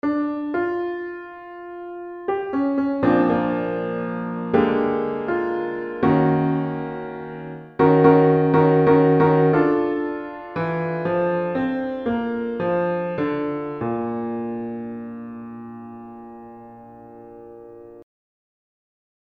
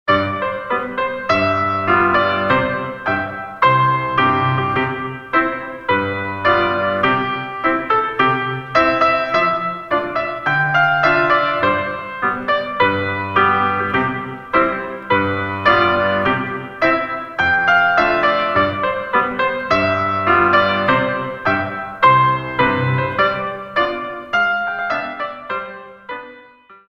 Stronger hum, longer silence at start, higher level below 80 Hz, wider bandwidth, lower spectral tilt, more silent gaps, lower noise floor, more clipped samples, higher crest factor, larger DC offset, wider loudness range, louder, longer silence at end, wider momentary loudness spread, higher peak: neither; about the same, 0.05 s vs 0.05 s; second, -56 dBFS vs -48 dBFS; second, 5 kHz vs 7.6 kHz; first, -10.5 dB/octave vs -6.5 dB/octave; neither; about the same, -42 dBFS vs -45 dBFS; neither; about the same, 20 dB vs 16 dB; neither; first, 16 LU vs 2 LU; second, -21 LUFS vs -17 LUFS; first, 1.35 s vs 0.15 s; first, 21 LU vs 9 LU; about the same, -2 dBFS vs 0 dBFS